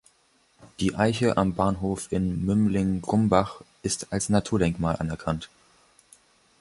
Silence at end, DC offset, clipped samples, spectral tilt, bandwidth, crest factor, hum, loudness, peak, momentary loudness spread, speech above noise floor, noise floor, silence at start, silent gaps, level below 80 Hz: 1.15 s; under 0.1%; under 0.1%; -6 dB/octave; 11.5 kHz; 22 dB; none; -26 LUFS; -4 dBFS; 8 LU; 40 dB; -64 dBFS; 0.6 s; none; -46 dBFS